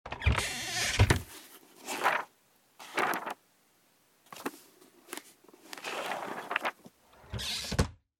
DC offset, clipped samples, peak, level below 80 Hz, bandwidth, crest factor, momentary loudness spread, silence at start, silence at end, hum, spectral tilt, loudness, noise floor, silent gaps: under 0.1%; under 0.1%; -8 dBFS; -44 dBFS; 17.5 kHz; 26 dB; 20 LU; 0.05 s; 0.25 s; none; -3.5 dB/octave; -32 LUFS; -68 dBFS; none